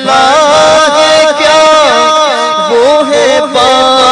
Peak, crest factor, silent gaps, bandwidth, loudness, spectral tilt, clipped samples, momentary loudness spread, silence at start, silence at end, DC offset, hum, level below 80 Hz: 0 dBFS; 6 dB; none; 12 kHz; -6 LUFS; -2 dB/octave; 2%; 3 LU; 0 s; 0 s; under 0.1%; none; -44 dBFS